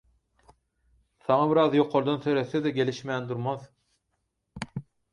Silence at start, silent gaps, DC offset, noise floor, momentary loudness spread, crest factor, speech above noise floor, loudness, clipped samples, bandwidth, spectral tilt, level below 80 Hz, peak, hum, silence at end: 1.3 s; none; under 0.1%; -78 dBFS; 16 LU; 20 dB; 53 dB; -26 LUFS; under 0.1%; 10.5 kHz; -7 dB/octave; -64 dBFS; -8 dBFS; none; 0.3 s